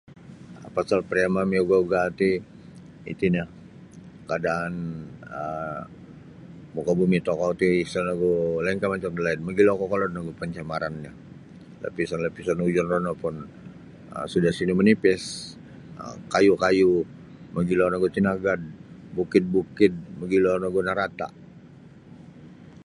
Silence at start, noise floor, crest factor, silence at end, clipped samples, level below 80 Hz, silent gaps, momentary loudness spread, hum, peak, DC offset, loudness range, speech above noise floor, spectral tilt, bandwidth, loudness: 0.1 s; -48 dBFS; 22 dB; 0 s; under 0.1%; -54 dBFS; none; 19 LU; none; -4 dBFS; under 0.1%; 6 LU; 24 dB; -6.5 dB/octave; 11.5 kHz; -24 LUFS